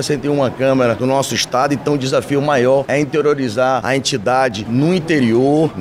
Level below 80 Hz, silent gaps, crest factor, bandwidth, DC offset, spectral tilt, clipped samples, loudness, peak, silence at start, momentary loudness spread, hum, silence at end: -48 dBFS; none; 12 dB; 15.5 kHz; under 0.1%; -5 dB/octave; under 0.1%; -15 LUFS; -4 dBFS; 0 s; 3 LU; none; 0 s